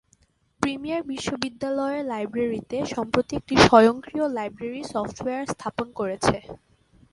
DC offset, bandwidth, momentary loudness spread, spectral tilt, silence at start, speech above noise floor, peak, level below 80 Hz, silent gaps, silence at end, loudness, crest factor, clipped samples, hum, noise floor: under 0.1%; 11.5 kHz; 13 LU; -5 dB/octave; 0.6 s; 40 dB; 0 dBFS; -50 dBFS; none; 0.55 s; -24 LUFS; 24 dB; under 0.1%; none; -64 dBFS